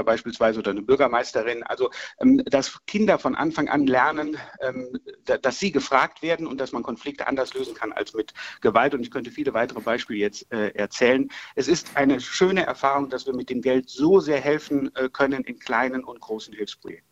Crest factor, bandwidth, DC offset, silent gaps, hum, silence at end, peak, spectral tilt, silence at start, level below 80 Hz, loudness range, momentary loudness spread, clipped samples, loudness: 20 dB; 12 kHz; under 0.1%; none; none; 0.15 s; -2 dBFS; -5 dB/octave; 0 s; -58 dBFS; 4 LU; 11 LU; under 0.1%; -24 LUFS